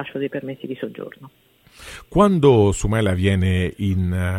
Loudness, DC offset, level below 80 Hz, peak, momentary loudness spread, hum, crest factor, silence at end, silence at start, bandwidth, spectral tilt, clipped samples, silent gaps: -19 LUFS; under 0.1%; -38 dBFS; -2 dBFS; 19 LU; none; 18 dB; 0 s; 0 s; 13 kHz; -7 dB/octave; under 0.1%; none